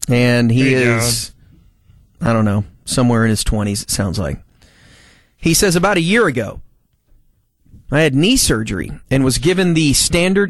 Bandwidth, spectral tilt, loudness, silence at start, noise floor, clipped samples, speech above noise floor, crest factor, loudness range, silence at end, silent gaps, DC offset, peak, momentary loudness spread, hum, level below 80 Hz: 13 kHz; -4.5 dB/octave; -15 LUFS; 0 s; -56 dBFS; under 0.1%; 41 dB; 16 dB; 3 LU; 0 s; none; under 0.1%; 0 dBFS; 10 LU; none; -32 dBFS